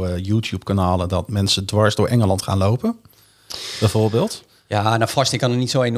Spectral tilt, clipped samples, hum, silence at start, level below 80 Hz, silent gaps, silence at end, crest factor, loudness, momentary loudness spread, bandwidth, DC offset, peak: -5.5 dB/octave; under 0.1%; none; 0 s; -52 dBFS; none; 0 s; 18 dB; -19 LUFS; 8 LU; 15 kHz; under 0.1%; -2 dBFS